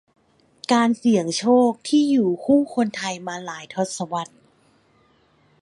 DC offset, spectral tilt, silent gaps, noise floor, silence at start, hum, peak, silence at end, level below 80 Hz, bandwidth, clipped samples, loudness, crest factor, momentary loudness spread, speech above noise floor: under 0.1%; -5 dB/octave; none; -60 dBFS; 0.7 s; none; -6 dBFS; 1.35 s; -68 dBFS; 11.5 kHz; under 0.1%; -21 LUFS; 16 dB; 13 LU; 39 dB